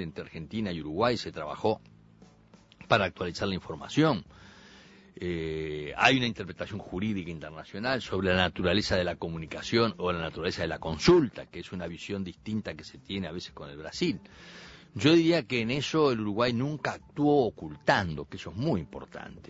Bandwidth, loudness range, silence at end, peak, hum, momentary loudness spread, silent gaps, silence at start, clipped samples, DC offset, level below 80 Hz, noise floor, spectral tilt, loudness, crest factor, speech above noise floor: 8 kHz; 4 LU; 0 s; -8 dBFS; none; 17 LU; none; 0 s; under 0.1%; under 0.1%; -54 dBFS; -58 dBFS; -5.5 dB/octave; -29 LUFS; 22 dB; 28 dB